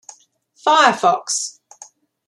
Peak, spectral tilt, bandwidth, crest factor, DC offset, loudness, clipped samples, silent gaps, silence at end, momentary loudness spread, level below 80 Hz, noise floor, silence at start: 0 dBFS; -1 dB/octave; 13 kHz; 20 dB; under 0.1%; -16 LUFS; under 0.1%; none; 0.8 s; 10 LU; -74 dBFS; -55 dBFS; 0.65 s